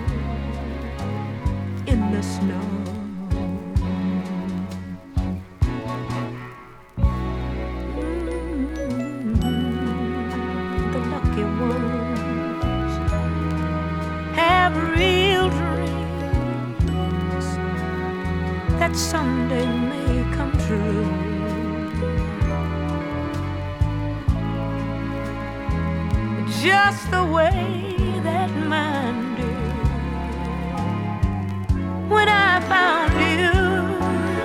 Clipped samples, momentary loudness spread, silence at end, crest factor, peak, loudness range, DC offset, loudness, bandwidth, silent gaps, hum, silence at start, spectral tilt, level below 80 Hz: under 0.1%; 10 LU; 0 s; 18 dB; -4 dBFS; 6 LU; under 0.1%; -23 LUFS; 15.5 kHz; none; none; 0 s; -6 dB/octave; -30 dBFS